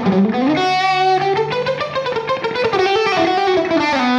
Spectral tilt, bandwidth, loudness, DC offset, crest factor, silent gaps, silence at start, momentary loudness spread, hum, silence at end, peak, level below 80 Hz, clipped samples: -5.5 dB/octave; 10 kHz; -16 LUFS; under 0.1%; 12 dB; none; 0 s; 5 LU; none; 0 s; -4 dBFS; -54 dBFS; under 0.1%